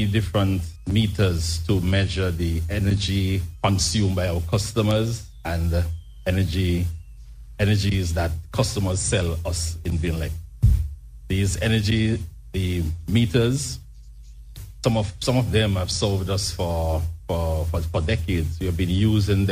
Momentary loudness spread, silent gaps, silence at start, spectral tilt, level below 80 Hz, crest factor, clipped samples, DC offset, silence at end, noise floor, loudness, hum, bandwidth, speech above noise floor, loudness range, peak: 8 LU; none; 0 s; -5.5 dB/octave; -32 dBFS; 18 dB; under 0.1%; under 0.1%; 0 s; -42 dBFS; -23 LUFS; none; 16 kHz; 20 dB; 2 LU; -4 dBFS